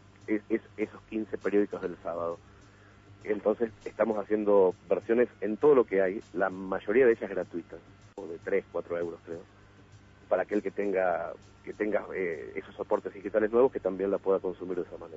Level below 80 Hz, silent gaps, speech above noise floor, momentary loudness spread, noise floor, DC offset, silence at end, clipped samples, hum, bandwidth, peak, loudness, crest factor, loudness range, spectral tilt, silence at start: -64 dBFS; none; 26 dB; 16 LU; -55 dBFS; under 0.1%; 0 s; under 0.1%; 50 Hz at -60 dBFS; 7.8 kHz; -12 dBFS; -30 LUFS; 18 dB; 7 LU; -8 dB/octave; 0.3 s